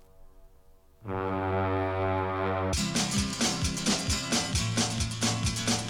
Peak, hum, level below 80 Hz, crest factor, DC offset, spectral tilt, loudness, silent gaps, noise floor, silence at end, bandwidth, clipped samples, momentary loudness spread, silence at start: -14 dBFS; none; -44 dBFS; 16 dB; under 0.1%; -3.5 dB/octave; -28 LUFS; none; -56 dBFS; 0 s; 18 kHz; under 0.1%; 3 LU; 0.2 s